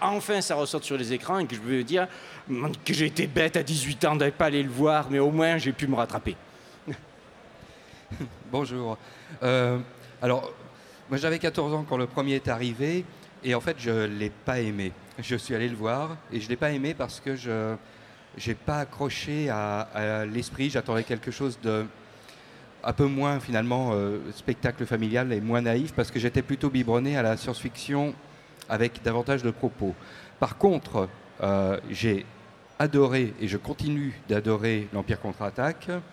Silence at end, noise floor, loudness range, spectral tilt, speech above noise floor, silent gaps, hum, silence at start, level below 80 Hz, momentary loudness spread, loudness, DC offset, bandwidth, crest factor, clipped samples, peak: 0 s; -51 dBFS; 5 LU; -5.5 dB/octave; 24 dB; none; none; 0 s; -54 dBFS; 11 LU; -28 LUFS; under 0.1%; 16.5 kHz; 20 dB; under 0.1%; -8 dBFS